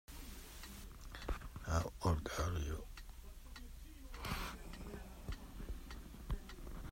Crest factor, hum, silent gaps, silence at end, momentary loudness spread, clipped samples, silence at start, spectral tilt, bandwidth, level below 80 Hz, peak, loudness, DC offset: 20 dB; none; none; 0 s; 16 LU; under 0.1%; 0.1 s; -5 dB/octave; 16 kHz; -48 dBFS; -24 dBFS; -46 LUFS; under 0.1%